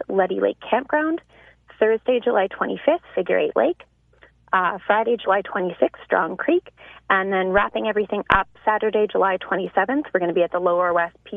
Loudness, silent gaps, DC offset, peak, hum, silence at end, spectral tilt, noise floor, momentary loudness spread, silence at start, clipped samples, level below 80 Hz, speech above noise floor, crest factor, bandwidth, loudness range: -21 LUFS; none; under 0.1%; 0 dBFS; none; 0 s; -8 dB/octave; -55 dBFS; 4 LU; 0 s; under 0.1%; -50 dBFS; 34 dB; 22 dB; 4.1 kHz; 2 LU